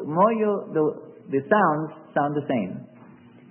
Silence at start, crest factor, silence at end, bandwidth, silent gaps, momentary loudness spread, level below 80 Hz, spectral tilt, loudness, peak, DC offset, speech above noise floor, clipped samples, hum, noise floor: 0 s; 18 dB; 0.65 s; 3.3 kHz; none; 10 LU; -72 dBFS; -11.5 dB/octave; -24 LUFS; -6 dBFS; under 0.1%; 26 dB; under 0.1%; none; -49 dBFS